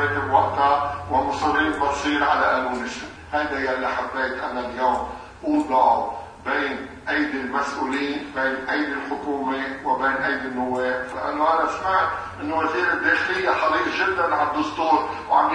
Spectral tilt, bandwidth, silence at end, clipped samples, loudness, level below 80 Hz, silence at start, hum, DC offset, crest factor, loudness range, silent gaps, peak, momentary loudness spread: -4.5 dB/octave; 10.5 kHz; 0 s; under 0.1%; -22 LUFS; -50 dBFS; 0 s; none; under 0.1%; 18 dB; 3 LU; none; -4 dBFS; 8 LU